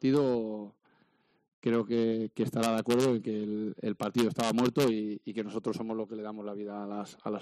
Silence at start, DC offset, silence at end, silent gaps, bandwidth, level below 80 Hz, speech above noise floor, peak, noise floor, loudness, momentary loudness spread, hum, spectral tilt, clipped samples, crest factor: 0 s; under 0.1%; 0 s; 1.53-1.62 s; 13.5 kHz; -70 dBFS; 40 dB; -14 dBFS; -70 dBFS; -31 LUFS; 12 LU; none; -6 dB/octave; under 0.1%; 16 dB